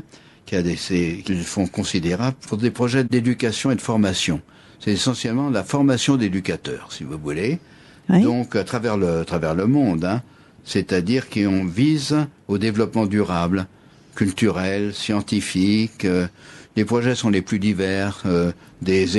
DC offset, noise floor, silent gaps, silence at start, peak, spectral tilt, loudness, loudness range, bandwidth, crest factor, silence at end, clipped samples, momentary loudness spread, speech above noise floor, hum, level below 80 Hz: under 0.1%; -46 dBFS; none; 0.45 s; -6 dBFS; -5.5 dB/octave; -21 LUFS; 1 LU; 12 kHz; 16 dB; 0 s; under 0.1%; 7 LU; 26 dB; none; -50 dBFS